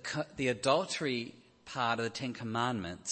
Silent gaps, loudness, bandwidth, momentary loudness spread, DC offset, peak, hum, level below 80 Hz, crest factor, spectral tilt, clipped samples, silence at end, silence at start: none; -34 LUFS; 8.8 kHz; 8 LU; under 0.1%; -14 dBFS; none; -68 dBFS; 20 dB; -4 dB/octave; under 0.1%; 0 s; 0 s